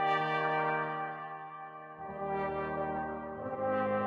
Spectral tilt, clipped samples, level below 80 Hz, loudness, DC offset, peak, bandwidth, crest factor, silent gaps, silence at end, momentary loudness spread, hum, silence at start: -7 dB/octave; under 0.1%; -66 dBFS; -35 LUFS; under 0.1%; -18 dBFS; 7.4 kHz; 16 dB; none; 0 s; 14 LU; none; 0 s